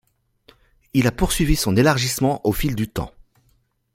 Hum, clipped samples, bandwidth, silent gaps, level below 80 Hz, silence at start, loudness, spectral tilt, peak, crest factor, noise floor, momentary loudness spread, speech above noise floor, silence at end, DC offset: none; under 0.1%; 16.5 kHz; none; -32 dBFS; 0.95 s; -20 LUFS; -5 dB/octave; -2 dBFS; 20 dB; -63 dBFS; 10 LU; 44 dB; 0.85 s; under 0.1%